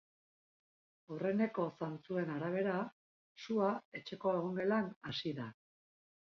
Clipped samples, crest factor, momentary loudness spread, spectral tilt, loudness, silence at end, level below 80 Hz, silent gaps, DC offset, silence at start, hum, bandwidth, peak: under 0.1%; 16 dB; 11 LU; -5 dB/octave; -38 LUFS; 0.8 s; -80 dBFS; 2.92-3.36 s, 3.85-3.92 s, 4.96-5.01 s; under 0.1%; 1.1 s; none; 6.6 kHz; -24 dBFS